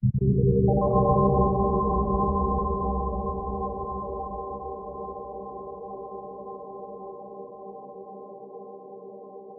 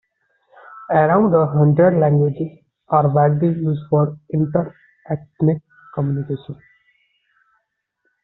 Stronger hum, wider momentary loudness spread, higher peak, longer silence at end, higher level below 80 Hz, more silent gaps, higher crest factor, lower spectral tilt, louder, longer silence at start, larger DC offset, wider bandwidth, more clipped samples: neither; first, 21 LU vs 15 LU; second, -8 dBFS vs -2 dBFS; second, 0 s vs 1.7 s; first, -36 dBFS vs -56 dBFS; neither; about the same, 18 dB vs 16 dB; first, -15 dB/octave vs -10 dB/octave; second, -26 LUFS vs -18 LUFS; second, 0 s vs 0.7 s; neither; second, 1.3 kHz vs 4 kHz; neither